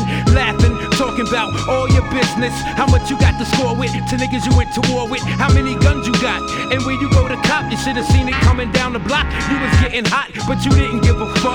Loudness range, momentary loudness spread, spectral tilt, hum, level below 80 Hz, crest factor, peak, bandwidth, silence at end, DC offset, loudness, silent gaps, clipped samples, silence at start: 1 LU; 5 LU; -5.5 dB/octave; none; -24 dBFS; 16 dB; 0 dBFS; 12.5 kHz; 0 s; under 0.1%; -16 LUFS; none; under 0.1%; 0 s